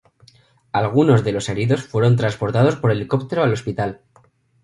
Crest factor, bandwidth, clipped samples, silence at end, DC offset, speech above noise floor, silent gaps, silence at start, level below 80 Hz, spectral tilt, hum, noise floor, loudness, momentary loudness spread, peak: 18 dB; 11.5 kHz; under 0.1%; 0.7 s; under 0.1%; 38 dB; none; 0.75 s; -50 dBFS; -7 dB/octave; none; -56 dBFS; -19 LUFS; 8 LU; -2 dBFS